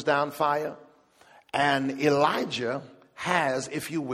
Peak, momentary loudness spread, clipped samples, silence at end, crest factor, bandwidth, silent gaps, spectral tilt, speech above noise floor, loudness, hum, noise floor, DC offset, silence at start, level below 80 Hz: -8 dBFS; 9 LU; under 0.1%; 0 s; 20 dB; 15.5 kHz; none; -4.5 dB/octave; 31 dB; -27 LUFS; none; -57 dBFS; under 0.1%; 0 s; -70 dBFS